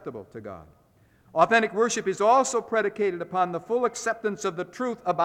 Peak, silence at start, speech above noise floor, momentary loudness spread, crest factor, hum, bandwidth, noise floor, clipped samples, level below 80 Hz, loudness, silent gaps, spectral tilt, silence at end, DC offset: -4 dBFS; 0.05 s; 34 dB; 19 LU; 20 dB; none; 14.5 kHz; -59 dBFS; under 0.1%; -68 dBFS; -25 LUFS; none; -3.5 dB/octave; 0 s; under 0.1%